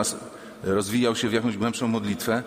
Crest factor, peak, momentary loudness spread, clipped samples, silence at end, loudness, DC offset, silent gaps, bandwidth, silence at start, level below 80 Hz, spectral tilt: 18 dB; -8 dBFS; 11 LU; under 0.1%; 0 s; -25 LUFS; under 0.1%; none; 16 kHz; 0 s; -58 dBFS; -4.5 dB/octave